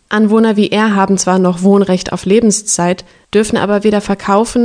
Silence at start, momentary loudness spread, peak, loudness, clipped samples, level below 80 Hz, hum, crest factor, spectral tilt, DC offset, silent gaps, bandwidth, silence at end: 0.1 s; 5 LU; 0 dBFS; -12 LUFS; 0.2%; -44 dBFS; none; 12 dB; -5 dB/octave; under 0.1%; none; 10 kHz; 0 s